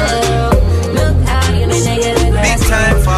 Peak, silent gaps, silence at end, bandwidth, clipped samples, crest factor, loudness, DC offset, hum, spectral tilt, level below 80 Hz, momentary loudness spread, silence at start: 0 dBFS; none; 0 s; 14 kHz; under 0.1%; 12 dB; -13 LUFS; under 0.1%; none; -5 dB/octave; -16 dBFS; 2 LU; 0 s